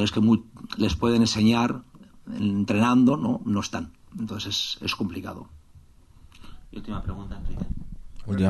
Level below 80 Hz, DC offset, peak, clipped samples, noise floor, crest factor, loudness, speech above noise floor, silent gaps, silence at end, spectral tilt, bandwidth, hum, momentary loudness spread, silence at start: -42 dBFS; under 0.1%; -8 dBFS; under 0.1%; -52 dBFS; 18 dB; -25 LUFS; 28 dB; none; 0 s; -5.5 dB/octave; 12.5 kHz; none; 19 LU; 0 s